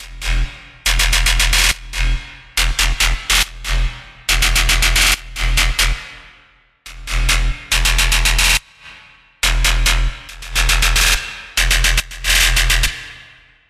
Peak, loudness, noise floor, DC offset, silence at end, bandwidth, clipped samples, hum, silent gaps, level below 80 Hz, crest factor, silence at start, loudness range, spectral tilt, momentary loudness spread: 0 dBFS; -15 LUFS; -51 dBFS; under 0.1%; 0.5 s; 15 kHz; under 0.1%; none; none; -20 dBFS; 16 dB; 0 s; 2 LU; -1 dB/octave; 11 LU